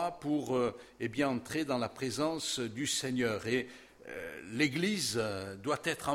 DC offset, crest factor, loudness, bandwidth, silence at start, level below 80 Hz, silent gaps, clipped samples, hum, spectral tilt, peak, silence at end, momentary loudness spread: under 0.1%; 20 dB; -34 LUFS; 16.5 kHz; 0 s; -66 dBFS; none; under 0.1%; none; -4 dB/octave; -14 dBFS; 0 s; 10 LU